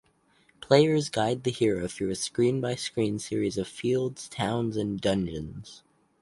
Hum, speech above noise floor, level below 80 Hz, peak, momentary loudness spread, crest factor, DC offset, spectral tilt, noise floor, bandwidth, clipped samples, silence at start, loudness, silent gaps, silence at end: none; 38 dB; -56 dBFS; -6 dBFS; 10 LU; 22 dB; under 0.1%; -5.5 dB/octave; -65 dBFS; 11.5 kHz; under 0.1%; 0.6 s; -27 LUFS; none; 0.45 s